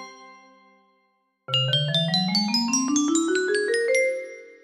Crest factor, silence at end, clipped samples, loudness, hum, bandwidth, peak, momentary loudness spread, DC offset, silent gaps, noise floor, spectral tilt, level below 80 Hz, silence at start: 16 dB; 0.1 s; under 0.1%; -22 LUFS; none; 15 kHz; -10 dBFS; 5 LU; under 0.1%; none; -69 dBFS; -3.5 dB/octave; -72 dBFS; 0 s